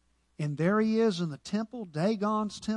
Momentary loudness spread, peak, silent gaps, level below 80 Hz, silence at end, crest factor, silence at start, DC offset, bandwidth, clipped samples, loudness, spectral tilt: 10 LU; -14 dBFS; none; -66 dBFS; 0 s; 14 dB; 0.4 s; under 0.1%; 11 kHz; under 0.1%; -30 LUFS; -6.5 dB/octave